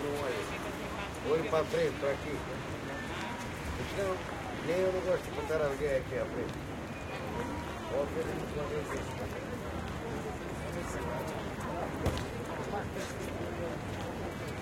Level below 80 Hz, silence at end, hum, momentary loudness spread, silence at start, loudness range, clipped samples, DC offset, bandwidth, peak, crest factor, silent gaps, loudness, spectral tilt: -50 dBFS; 0 s; none; 7 LU; 0 s; 3 LU; under 0.1%; under 0.1%; 16.5 kHz; -16 dBFS; 20 dB; none; -36 LUFS; -5.5 dB/octave